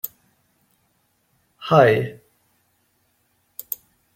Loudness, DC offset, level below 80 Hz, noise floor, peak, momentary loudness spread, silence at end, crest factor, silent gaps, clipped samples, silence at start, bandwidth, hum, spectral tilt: -20 LUFS; under 0.1%; -64 dBFS; -67 dBFS; -2 dBFS; 23 LU; 2 s; 22 dB; none; under 0.1%; 0.05 s; 16.5 kHz; none; -6 dB/octave